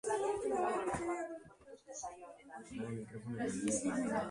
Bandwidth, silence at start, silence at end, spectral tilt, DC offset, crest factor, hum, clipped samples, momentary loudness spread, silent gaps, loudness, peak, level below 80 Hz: 11.5 kHz; 0.05 s; 0 s; -5 dB/octave; under 0.1%; 16 dB; none; under 0.1%; 17 LU; none; -39 LUFS; -22 dBFS; -66 dBFS